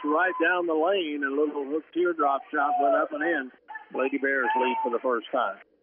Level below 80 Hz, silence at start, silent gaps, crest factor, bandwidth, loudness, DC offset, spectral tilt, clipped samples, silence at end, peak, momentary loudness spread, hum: -86 dBFS; 0 s; none; 14 dB; 3.6 kHz; -26 LUFS; under 0.1%; -0.5 dB/octave; under 0.1%; 0.25 s; -12 dBFS; 7 LU; none